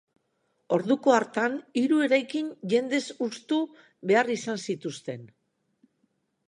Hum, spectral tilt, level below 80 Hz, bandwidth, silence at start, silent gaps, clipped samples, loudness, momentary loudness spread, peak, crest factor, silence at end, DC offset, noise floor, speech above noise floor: none; -5 dB/octave; -80 dBFS; 11 kHz; 0.7 s; none; under 0.1%; -27 LUFS; 13 LU; -8 dBFS; 20 dB; 1.2 s; under 0.1%; -74 dBFS; 48 dB